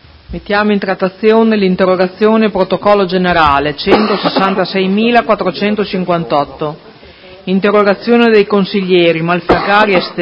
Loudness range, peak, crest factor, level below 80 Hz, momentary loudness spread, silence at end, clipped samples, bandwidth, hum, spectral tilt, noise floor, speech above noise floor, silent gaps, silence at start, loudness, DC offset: 3 LU; 0 dBFS; 12 dB; -38 dBFS; 7 LU; 0 s; 0.2%; 6.4 kHz; none; -8 dB/octave; -36 dBFS; 25 dB; none; 0.3 s; -11 LUFS; under 0.1%